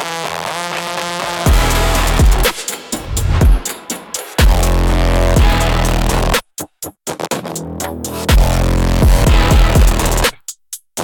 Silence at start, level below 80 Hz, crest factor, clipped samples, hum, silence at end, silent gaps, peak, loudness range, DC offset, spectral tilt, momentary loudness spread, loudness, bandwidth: 0 s; -16 dBFS; 12 dB; under 0.1%; none; 0 s; none; -2 dBFS; 3 LU; under 0.1%; -4.5 dB/octave; 12 LU; -15 LUFS; 18 kHz